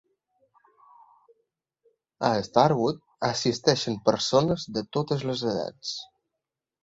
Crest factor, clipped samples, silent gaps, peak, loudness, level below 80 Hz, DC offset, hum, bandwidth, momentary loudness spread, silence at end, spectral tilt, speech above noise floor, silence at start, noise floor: 24 dB; under 0.1%; none; -4 dBFS; -26 LUFS; -60 dBFS; under 0.1%; none; 8 kHz; 11 LU; 0.8 s; -5 dB/octave; 61 dB; 2.2 s; -86 dBFS